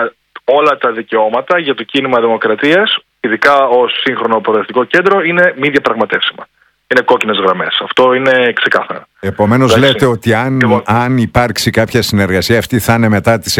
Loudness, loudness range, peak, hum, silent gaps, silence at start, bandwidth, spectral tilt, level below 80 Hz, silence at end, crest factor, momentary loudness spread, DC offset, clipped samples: -11 LUFS; 1 LU; 0 dBFS; none; none; 0 s; 18 kHz; -5 dB/octave; -42 dBFS; 0 s; 12 dB; 6 LU; under 0.1%; 0.6%